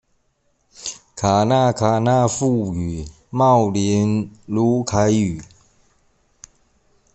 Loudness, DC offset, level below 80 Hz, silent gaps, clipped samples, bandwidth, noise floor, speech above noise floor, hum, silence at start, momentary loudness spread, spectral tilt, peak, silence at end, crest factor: -18 LUFS; under 0.1%; -48 dBFS; none; under 0.1%; 8.6 kHz; -65 dBFS; 48 dB; none; 0.8 s; 15 LU; -6 dB/octave; -2 dBFS; 1.7 s; 18 dB